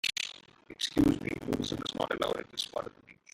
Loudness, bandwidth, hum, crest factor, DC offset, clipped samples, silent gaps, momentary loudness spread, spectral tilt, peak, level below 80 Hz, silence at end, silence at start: -33 LUFS; 16 kHz; none; 18 dB; under 0.1%; under 0.1%; none; 14 LU; -4 dB/octave; -16 dBFS; -54 dBFS; 0.2 s; 0.05 s